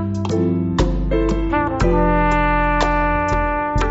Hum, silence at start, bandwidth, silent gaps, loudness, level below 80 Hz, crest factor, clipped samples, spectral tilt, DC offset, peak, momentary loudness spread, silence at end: none; 0 s; 8 kHz; none; -18 LUFS; -24 dBFS; 14 dB; under 0.1%; -5.5 dB/octave; under 0.1%; -2 dBFS; 4 LU; 0 s